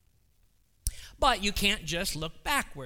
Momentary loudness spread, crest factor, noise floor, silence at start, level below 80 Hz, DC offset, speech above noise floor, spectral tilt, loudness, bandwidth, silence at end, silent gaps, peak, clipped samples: 12 LU; 22 dB; -67 dBFS; 0.85 s; -42 dBFS; under 0.1%; 38 dB; -2.5 dB/octave; -29 LUFS; 19 kHz; 0 s; none; -10 dBFS; under 0.1%